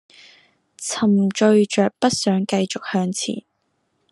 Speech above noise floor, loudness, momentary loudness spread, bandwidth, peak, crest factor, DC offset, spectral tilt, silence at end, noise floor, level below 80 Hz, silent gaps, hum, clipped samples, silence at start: 51 dB; -19 LUFS; 11 LU; 12 kHz; -4 dBFS; 18 dB; under 0.1%; -5 dB/octave; 0.7 s; -70 dBFS; -66 dBFS; none; none; under 0.1%; 0.8 s